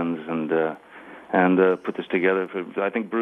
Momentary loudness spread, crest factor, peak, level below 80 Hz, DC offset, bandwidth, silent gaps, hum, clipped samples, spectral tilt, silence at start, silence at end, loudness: 12 LU; 18 dB; -6 dBFS; -74 dBFS; under 0.1%; 4 kHz; none; none; under 0.1%; -8.5 dB/octave; 0 s; 0 s; -23 LUFS